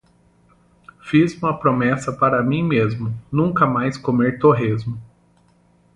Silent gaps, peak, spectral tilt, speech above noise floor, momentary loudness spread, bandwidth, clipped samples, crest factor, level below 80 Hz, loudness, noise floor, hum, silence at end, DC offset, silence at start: none; -2 dBFS; -8 dB/octave; 38 dB; 9 LU; 11 kHz; under 0.1%; 18 dB; -52 dBFS; -19 LUFS; -57 dBFS; none; 0.9 s; under 0.1%; 1.05 s